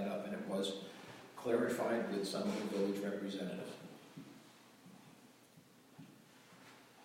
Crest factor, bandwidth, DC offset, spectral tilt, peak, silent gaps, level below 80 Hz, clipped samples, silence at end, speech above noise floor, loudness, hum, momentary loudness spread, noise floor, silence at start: 22 dB; 16.5 kHz; under 0.1%; -5 dB/octave; -20 dBFS; none; -82 dBFS; under 0.1%; 0 s; 26 dB; -40 LUFS; none; 24 LU; -64 dBFS; 0 s